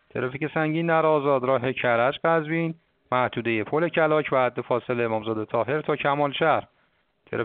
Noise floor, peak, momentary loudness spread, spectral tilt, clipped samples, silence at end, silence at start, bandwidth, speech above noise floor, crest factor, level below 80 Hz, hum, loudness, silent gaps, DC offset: -67 dBFS; -6 dBFS; 6 LU; -4.5 dB/octave; under 0.1%; 0 s; 0.15 s; 4.5 kHz; 44 dB; 18 dB; -66 dBFS; none; -24 LUFS; none; under 0.1%